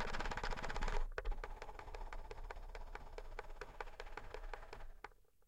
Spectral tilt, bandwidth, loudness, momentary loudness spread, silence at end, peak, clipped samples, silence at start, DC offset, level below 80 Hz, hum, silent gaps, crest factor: -4 dB/octave; 9.2 kHz; -50 LUFS; 11 LU; 0.35 s; -26 dBFS; under 0.1%; 0 s; under 0.1%; -46 dBFS; none; none; 18 dB